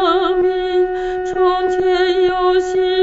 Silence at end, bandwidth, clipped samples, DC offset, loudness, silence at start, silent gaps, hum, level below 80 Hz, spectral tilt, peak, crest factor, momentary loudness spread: 0 s; 7.8 kHz; under 0.1%; under 0.1%; -16 LUFS; 0 s; none; none; -40 dBFS; -4.5 dB/octave; -4 dBFS; 12 dB; 4 LU